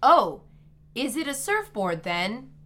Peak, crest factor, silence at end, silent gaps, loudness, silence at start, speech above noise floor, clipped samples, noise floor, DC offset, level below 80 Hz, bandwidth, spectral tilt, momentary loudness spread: -6 dBFS; 20 dB; 0.15 s; none; -26 LUFS; 0 s; 28 dB; under 0.1%; -52 dBFS; under 0.1%; -58 dBFS; 17 kHz; -3.5 dB/octave; 11 LU